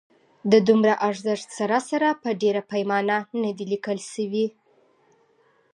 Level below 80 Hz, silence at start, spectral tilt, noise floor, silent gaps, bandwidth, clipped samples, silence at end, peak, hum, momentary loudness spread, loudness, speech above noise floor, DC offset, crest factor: -76 dBFS; 0.45 s; -5.5 dB/octave; -62 dBFS; none; 11 kHz; under 0.1%; 1.25 s; -4 dBFS; none; 10 LU; -23 LUFS; 40 dB; under 0.1%; 20 dB